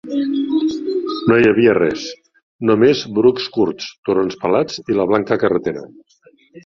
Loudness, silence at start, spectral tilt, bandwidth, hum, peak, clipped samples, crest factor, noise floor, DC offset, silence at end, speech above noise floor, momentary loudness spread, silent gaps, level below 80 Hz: -17 LUFS; 0.05 s; -6 dB/octave; 7.2 kHz; none; -2 dBFS; under 0.1%; 16 dB; -52 dBFS; under 0.1%; 0.05 s; 36 dB; 9 LU; 2.43-2.59 s, 3.98-4.03 s; -54 dBFS